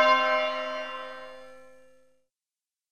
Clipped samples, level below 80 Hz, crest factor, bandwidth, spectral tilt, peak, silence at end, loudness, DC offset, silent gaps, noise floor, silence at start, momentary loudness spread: under 0.1%; -74 dBFS; 20 dB; 9 kHz; -1.5 dB/octave; -10 dBFS; 1.3 s; -27 LUFS; 0.3%; none; under -90 dBFS; 0 s; 23 LU